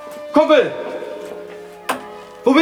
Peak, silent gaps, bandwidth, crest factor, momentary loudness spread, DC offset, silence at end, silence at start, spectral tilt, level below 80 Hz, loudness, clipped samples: 0 dBFS; none; 17 kHz; 18 dB; 20 LU; under 0.1%; 0 s; 0 s; -4.5 dB/octave; -60 dBFS; -18 LUFS; under 0.1%